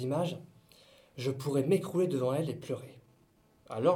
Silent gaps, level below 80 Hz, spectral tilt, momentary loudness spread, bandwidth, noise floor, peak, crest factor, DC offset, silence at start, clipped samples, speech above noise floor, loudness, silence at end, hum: none; -74 dBFS; -7 dB/octave; 15 LU; 17.5 kHz; -66 dBFS; -14 dBFS; 18 dB; under 0.1%; 0 s; under 0.1%; 34 dB; -33 LUFS; 0 s; none